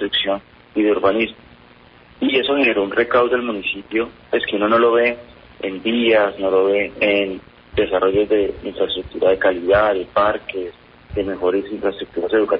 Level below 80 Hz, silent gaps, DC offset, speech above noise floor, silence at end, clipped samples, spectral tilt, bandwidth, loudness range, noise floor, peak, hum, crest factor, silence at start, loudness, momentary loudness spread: -46 dBFS; none; under 0.1%; 29 dB; 0 s; under 0.1%; -9.5 dB/octave; 5.4 kHz; 2 LU; -47 dBFS; -4 dBFS; none; 16 dB; 0 s; -18 LUFS; 10 LU